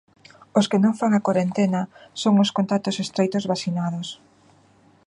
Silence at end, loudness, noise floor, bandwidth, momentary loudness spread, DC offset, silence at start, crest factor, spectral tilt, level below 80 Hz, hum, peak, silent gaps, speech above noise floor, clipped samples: 0.95 s; -22 LUFS; -56 dBFS; 10.5 kHz; 9 LU; under 0.1%; 0.55 s; 18 dB; -6 dB/octave; -68 dBFS; none; -4 dBFS; none; 35 dB; under 0.1%